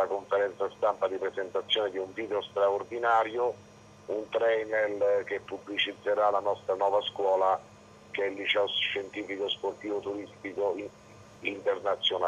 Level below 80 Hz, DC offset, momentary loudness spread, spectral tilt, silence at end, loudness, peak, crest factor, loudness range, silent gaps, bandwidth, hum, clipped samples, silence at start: -72 dBFS; under 0.1%; 10 LU; -4 dB/octave; 0 s; -30 LUFS; -14 dBFS; 16 dB; 3 LU; none; 9 kHz; none; under 0.1%; 0 s